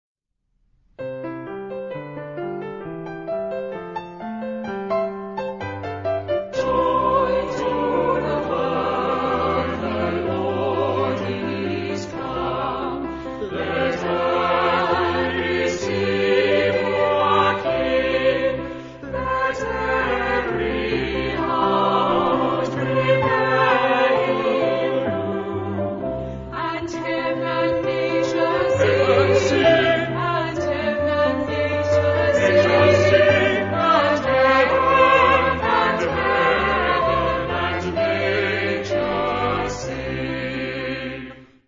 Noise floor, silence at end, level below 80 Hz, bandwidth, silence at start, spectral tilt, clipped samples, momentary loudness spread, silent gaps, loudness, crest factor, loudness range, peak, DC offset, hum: -69 dBFS; 0.25 s; -44 dBFS; 7.6 kHz; 1 s; -6 dB/octave; under 0.1%; 13 LU; none; -20 LUFS; 18 dB; 9 LU; -2 dBFS; under 0.1%; none